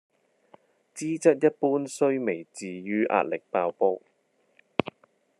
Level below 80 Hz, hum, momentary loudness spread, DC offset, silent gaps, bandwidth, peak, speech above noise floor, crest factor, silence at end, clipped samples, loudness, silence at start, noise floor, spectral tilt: -76 dBFS; none; 14 LU; under 0.1%; none; 12.5 kHz; -4 dBFS; 39 dB; 24 dB; 0.5 s; under 0.1%; -27 LUFS; 0.95 s; -65 dBFS; -5.5 dB/octave